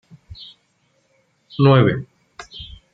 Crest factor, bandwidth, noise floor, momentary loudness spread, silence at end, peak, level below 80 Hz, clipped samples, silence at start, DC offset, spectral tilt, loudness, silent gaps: 20 dB; 7 kHz; -64 dBFS; 26 LU; 0.3 s; -2 dBFS; -50 dBFS; under 0.1%; 0.4 s; under 0.1%; -8.5 dB/octave; -16 LUFS; none